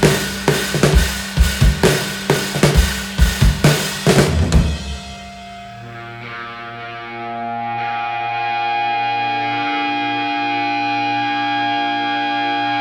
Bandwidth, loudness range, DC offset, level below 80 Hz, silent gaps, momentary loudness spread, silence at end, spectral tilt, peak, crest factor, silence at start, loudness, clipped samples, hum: 19 kHz; 9 LU; under 0.1%; -24 dBFS; none; 15 LU; 0 s; -4.5 dB/octave; 0 dBFS; 18 dB; 0 s; -17 LUFS; under 0.1%; none